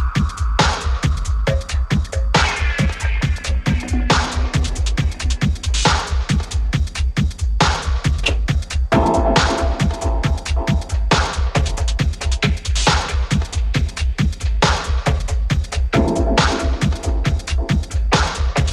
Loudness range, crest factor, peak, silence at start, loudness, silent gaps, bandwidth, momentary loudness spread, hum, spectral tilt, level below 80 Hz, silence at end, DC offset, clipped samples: 1 LU; 16 dB; 0 dBFS; 0 s; -19 LUFS; none; 11.5 kHz; 4 LU; none; -5 dB/octave; -20 dBFS; 0 s; under 0.1%; under 0.1%